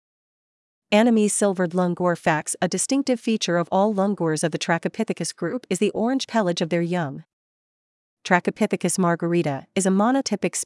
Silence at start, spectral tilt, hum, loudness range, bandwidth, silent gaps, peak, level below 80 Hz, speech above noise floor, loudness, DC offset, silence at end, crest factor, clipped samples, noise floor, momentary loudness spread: 0.9 s; -4.5 dB/octave; none; 3 LU; 12 kHz; 7.33-8.17 s; -4 dBFS; -70 dBFS; over 68 dB; -22 LUFS; under 0.1%; 0 s; 20 dB; under 0.1%; under -90 dBFS; 7 LU